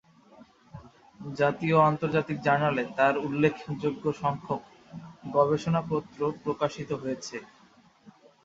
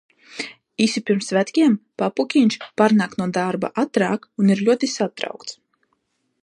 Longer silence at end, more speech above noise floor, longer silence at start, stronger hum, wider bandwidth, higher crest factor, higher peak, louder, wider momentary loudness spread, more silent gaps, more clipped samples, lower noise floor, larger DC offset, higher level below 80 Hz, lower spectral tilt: second, 0.35 s vs 0.9 s; second, 32 dB vs 51 dB; about the same, 0.4 s vs 0.3 s; neither; second, 7.8 kHz vs 11 kHz; about the same, 20 dB vs 18 dB; second, -8 dBFS vs -2 dBFS; second, -27 LUFS vs -20 LUFS; about the same, 16 LU vs 14 LU; neither; neither; second, -59 dBFS vs -70 dBFS; neither; first, -62 dBFS vs -68 dBFS; first, -7 dB/octave vs -5.5 dB/octave